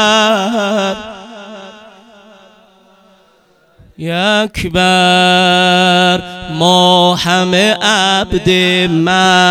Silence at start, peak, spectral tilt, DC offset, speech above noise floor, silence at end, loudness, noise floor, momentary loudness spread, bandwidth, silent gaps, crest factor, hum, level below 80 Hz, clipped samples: 0 s; 0 dBFS; -4 dB/octave; under 0.1%; 40 dB; 0 s; -10 LUFS; -51 dBFS; 16 LU; 16 kHz; none; 12 dB; none; -40 dBFS; 0.5%